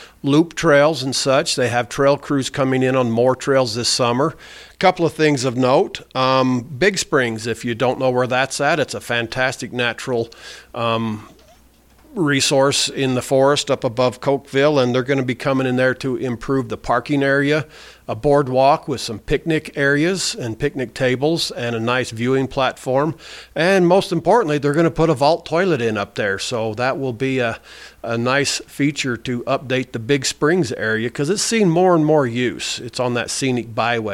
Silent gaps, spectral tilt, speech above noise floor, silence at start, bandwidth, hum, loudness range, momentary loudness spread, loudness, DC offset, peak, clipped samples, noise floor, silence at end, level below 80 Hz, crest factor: none; -4.5 dB/octave; 33 dB; 0 s; 16.5 kHz; none; 4 LU; 8 LU; -18 LUFS; under 0.1%; -2 dBFS; under 0.1%; -51 dBFS; 0 s; -48 dBFS; 16 dB